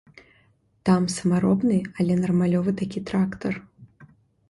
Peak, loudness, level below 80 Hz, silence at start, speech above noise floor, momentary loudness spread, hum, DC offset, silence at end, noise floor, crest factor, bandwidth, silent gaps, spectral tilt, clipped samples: -8 dBFS; -23 LUFS; -56 dBFS; 0.85 s; 40 dB; 8 LU; none; under 0.1%; 0.45 s; -62 dBFS; 16 dB; 11.5 kHz; none; -7 dB/octave; under 0.1%